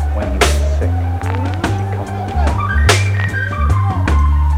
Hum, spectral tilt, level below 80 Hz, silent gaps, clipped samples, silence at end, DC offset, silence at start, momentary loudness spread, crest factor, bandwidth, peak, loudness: none; -5 dB/octave; -18 dBFS; none; under 0.1%; 0 s; under 0.1%; 0 s; 6 LU; 14 dB; 14.5 kHz; 0 dBFS; -16 LUFS